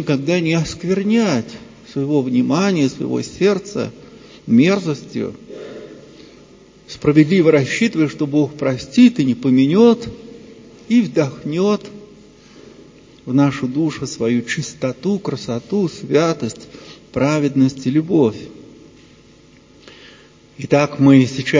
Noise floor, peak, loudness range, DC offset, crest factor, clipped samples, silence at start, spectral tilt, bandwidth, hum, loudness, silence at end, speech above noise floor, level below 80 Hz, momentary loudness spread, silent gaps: -47 dBFS; 0 dBFS; 6 LU; under 0.1%; 18 dB; under 0.1%; 0 s; -6.5 dB/octave; 7.6 kHz; none; -17 LUFS; 0 s; 31 dB; -52 dBFS; 20 LU; none